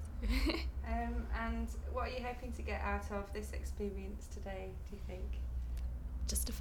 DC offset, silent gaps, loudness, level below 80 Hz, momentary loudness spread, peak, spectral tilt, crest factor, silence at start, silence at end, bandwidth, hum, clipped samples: under 0.1%; none; -41 LUFS; -42 dBFS; 8 LU; -20 dBFS; -5 dB/octave; 18 dB; 0 s; 0 s; 19 kHz; none; under 0.1%